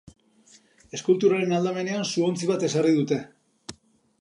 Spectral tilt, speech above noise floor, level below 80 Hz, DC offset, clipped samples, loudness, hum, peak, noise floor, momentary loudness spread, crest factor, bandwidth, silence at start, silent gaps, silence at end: -5.5 dB/octave; 34 dB; -68 dBFS; under 0.1%; under 0.1%; -24 LUFS; none; -8 dBFS; -57 dBFS; 22 LU; 16 dB; 11.5 kHz; 0.95 s; none; 0.5 s